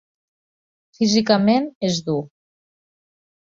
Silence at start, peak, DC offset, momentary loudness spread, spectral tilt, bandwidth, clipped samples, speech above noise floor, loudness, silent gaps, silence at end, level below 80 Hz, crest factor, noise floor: 1 s; -2 dBFS; under 0.1%; 8 LU; -5 dB/octave; 7.6 kHz; under 0.1%; over 71 dB; -19 LUFS; 1.75-1.81 s; 1.2 s; -62 dBFS; 20 dB; under -90 dBFS